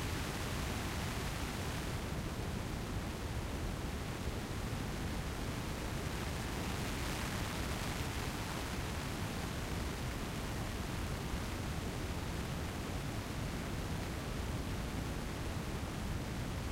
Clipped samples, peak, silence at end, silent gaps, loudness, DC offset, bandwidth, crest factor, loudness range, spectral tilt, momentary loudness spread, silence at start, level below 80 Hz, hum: under 0.1%; -24 dBFS; 0 s; none; -40 LUFS; under 0.1%; 16 kHz; 14 dB; 1 LU; -5 dB/octave; 2 LU; 0 s; -46 dBFS; none